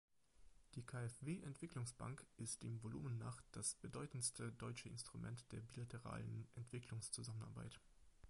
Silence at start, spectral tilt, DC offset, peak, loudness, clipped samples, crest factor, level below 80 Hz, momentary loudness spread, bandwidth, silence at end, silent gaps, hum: 0.35 s; -4.5 dB/octave; under 0.1%; -30 dBFS; -51 LUFS; under 0.1%; 22 dB; -72 dBFS; 8 LU; 11.5 kHz; 0 s; none; none